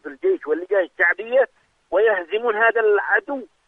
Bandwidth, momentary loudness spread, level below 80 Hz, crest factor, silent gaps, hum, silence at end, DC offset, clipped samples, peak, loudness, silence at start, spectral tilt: 3.9 kHz; 6 LU; -68 dBFS; 16 dB; none; none; 0.2 s; under 0.1%; under 0.1%; -6 dBFS; -20 LUFS; 0.05 s; -5 dB/octave